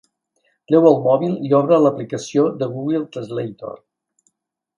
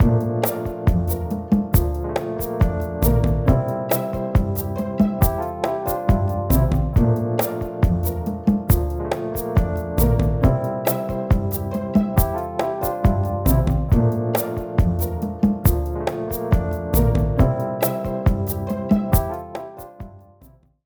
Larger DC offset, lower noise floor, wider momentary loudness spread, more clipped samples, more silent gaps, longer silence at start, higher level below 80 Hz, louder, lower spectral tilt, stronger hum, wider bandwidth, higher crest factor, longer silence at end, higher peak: neither; first, -74 dBFS vs -51 dBFS; first, 14 LU vs 7 LU; neither; neither; first, 0.7 s vs 0 s; second, -66 dBFS vs -26 dBFS; first, -18 LUFS vs -21 LUFS; about the same, -7.5 dB/octave vs -7.5 dB/octave; neither; second, 10 kHz vs over 20 kHz; about the same, 18 dB vs 16 dB; first, 1 s vs 0.65 s; first, 0 dBFS vs -4 dBFS